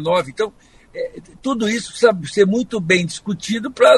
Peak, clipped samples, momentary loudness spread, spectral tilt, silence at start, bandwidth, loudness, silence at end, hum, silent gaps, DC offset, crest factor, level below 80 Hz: 0 dBFS; under 0.1%; 13 LU; -4.5 dB/octave; 0 s; 11.5 kHz; -19 LUFS; 0 s; none; none; under 0.1%; 18 dB; -54 dBFS